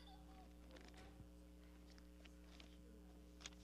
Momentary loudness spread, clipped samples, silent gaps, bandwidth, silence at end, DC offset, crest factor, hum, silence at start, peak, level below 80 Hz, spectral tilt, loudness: 4 LU; under 0.1%; none; 15 kHz; 0 s; under 0.1%; 26 dB; none; 0 s; -36 dBFS; -64 dBFS; -4 dB/octave; -63 LUFS